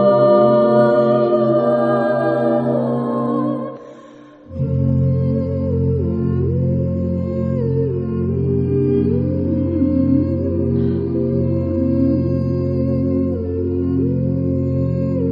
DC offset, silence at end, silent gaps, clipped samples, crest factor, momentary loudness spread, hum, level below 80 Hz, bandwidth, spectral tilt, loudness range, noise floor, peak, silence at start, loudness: under 0.1%; 0 s; none; under 0.1%; 14 dB; 7 LU; none; -38 dBFS; 5 kHz; -11.5 dB/octave; 4 LU; -41 dBFS; -2 dBFS; 0 s; -18 LUFS